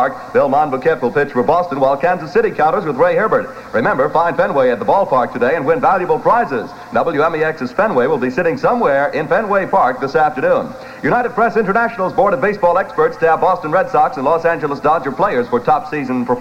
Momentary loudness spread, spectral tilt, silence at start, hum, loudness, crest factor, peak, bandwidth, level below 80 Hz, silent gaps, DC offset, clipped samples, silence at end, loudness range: 3 LU; -7 dB/octave; 0 s; none; -15 LUFS; 14 dB; -2 dBFS; 9.2 kHz; -48 dBFS; none; under 0.1%; under 0.1%; 0 s; 1 LU